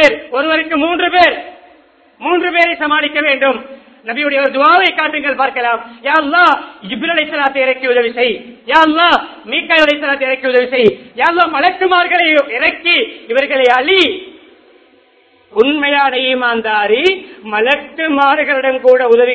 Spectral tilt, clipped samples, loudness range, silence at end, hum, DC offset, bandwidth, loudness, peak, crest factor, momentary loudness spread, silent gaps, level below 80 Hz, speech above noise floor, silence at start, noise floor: -4 dB/octave; 0.2%; 2 LU; 0 s; none; under 0.1%; 8 kHz; -12 LUFS; 0 dBFS; 12 dB; 8 LU; none; -54 dBFS; 37 dB; 0 s; -50 dBFS